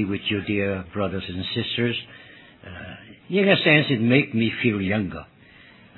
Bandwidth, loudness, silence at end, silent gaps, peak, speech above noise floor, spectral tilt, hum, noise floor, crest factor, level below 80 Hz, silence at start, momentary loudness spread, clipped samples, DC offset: 4.3 kHz; -22 LUFS; 0.75 s; none; -2 dBFS; 27 dB; -9 dB/octave; none; -50 dBFS; 22 dB; -56 dBFS; 0 s; 21 LU; under 0.1%; under 0.1%